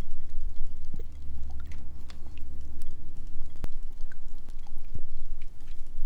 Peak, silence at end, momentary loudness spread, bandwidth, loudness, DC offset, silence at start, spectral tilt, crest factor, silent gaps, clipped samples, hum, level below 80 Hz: -12 dBFS; 0 s; 6 LU; 0.9 kHz; -44 LUFS; under 0.1%; 0 s; -6.5 dB/octave; 10 dB; none; under 0.1%; none; -32 dBFS